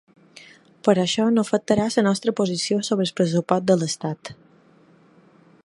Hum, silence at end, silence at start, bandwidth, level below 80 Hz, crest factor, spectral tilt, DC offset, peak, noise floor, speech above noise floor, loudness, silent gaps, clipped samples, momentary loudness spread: none; 1.3 s; 0.85 s; 11.5 kHz; -60 dBFS; 20 dB; -5 dB/octave; under 0.1%; -2 dBFS; -54 dBFS; 33 dB; -21 LUFS; none; under 0.1%; 7 LU